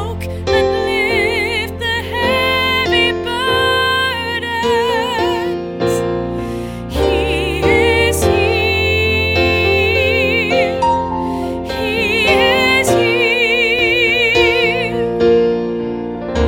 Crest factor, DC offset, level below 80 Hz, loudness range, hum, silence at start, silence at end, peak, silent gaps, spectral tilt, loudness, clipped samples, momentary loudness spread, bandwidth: 14 dB; under 0.1%; -32 dBFS; 4 LU; none; 0 s; 0 s; 0 dBFS; none; -4.5 dB/octave; -14 LUFS; under 0.1%; 9 LU; 17 kHz